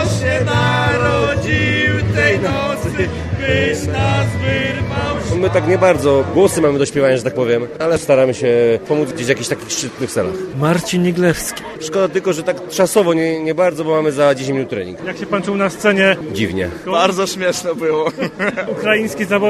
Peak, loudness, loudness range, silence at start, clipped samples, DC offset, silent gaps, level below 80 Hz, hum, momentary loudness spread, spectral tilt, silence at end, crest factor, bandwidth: 0 dBFS; -16 LUFS; 3 LU; 0 s; under 0.1%; under 0.1%; none; -38 dBFS; none; 7 LU; -5 dB/octave; 0 s; 16 dB; 14 kHz